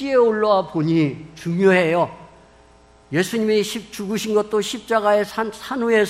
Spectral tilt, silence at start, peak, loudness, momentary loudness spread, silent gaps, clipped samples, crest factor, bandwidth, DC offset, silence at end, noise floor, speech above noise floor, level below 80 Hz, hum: -5.5 dB/octave; 0 s; -2 dBFS; -20 LUFS; 10 LU; none; under 0.1%; 18 dB; 16 kHz; under 0.1%; 0 s; -50 dBFS; 31 dB; -56 dBFS; none